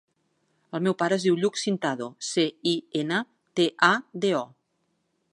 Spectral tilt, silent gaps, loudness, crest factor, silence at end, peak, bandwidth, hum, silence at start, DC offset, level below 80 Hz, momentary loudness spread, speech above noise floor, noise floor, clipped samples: -4.5 dB/octave; none; -26 LUFS; 22 dB; 0.85 s; -4 dBFS; 11.5 kHz; none; 0.75 s; under 0.1%; -78 dBFS; 8 LU; 49 dB; -74 dBFS; under 0.1%